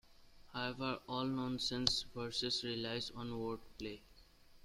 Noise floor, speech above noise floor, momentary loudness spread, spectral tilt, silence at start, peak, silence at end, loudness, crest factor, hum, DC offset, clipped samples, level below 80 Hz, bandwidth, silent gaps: -63 dBFS; 22 dB; 13 LU; -4 dB/octave; 0.1 s; -12 dBFS; 0.05 s; -40 LUFS; 30 dB; none; under 0.1%; under 0.1%; -62 dBFS; 15.5 kHz; none